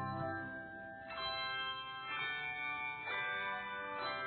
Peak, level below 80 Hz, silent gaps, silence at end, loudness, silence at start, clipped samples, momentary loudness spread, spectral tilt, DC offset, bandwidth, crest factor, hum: -28 dBFS; -72 dBFS; none; 0 s; -40 LUFS; 0 s; under 0.1%; 8 LU; -1 dB/octave; under 0.1%; 4.6 kHz; 14 dB; none